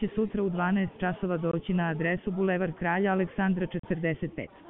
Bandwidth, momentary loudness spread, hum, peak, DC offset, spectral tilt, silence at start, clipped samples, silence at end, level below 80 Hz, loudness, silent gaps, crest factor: 3.8 kHz; 4 LU; none; -14 dBFS; under 0.1%; -6.5 dB/octave; 0 s; under 0.1%; 0 s; -52 dBFS; -29 LUFS; 3.79-3.83 s; 14 dB